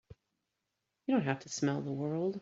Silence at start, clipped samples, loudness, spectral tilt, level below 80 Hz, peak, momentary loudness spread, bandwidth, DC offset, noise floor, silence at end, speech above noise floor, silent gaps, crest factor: 0.1 s; under 0.1%; -35 LUFS; -6 dB/octave; -74 dBFS; -16 dBFS; 4 LU; 8 kHz; under 0.1%; -86 dBFS; 0 s; 52 dB; none; 20 dB